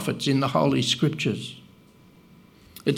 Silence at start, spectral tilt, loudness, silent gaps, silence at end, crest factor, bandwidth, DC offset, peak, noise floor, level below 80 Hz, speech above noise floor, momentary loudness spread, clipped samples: 0 s; -5 dB/octave; -24 LUFS; none; 0 s; 20 dB; 16.5 kHz; under 0.1%; -6 dBFS; -53 dBFS; -62 dBFS; 30 dB; 10 LU; under 0.1%